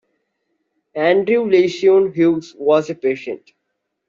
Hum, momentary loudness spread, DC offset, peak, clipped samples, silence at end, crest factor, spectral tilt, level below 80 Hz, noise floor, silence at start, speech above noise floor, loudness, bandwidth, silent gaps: none; 13 LU; under 0.1%; -4 dBFS; under 0.1%; 0.7 s; 14 dB; -6.5 dB/octave; -64 dBFS; -75 dBFS; 0.95 s; 59 dB; -16 LUFS; 7.4 kHz; none